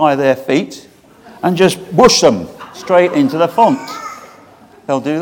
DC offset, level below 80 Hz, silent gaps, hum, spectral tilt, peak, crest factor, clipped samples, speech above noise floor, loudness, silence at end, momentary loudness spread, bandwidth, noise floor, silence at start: under 0.1%; -46 dBFS; none; none; -4.5 dB/octave; 0 dBFS; 14 dB; 0.2%; 30 dB; -13 LUFS; 0 s; 20 LU; 18.5 kHz; -42 dBFS; 0 s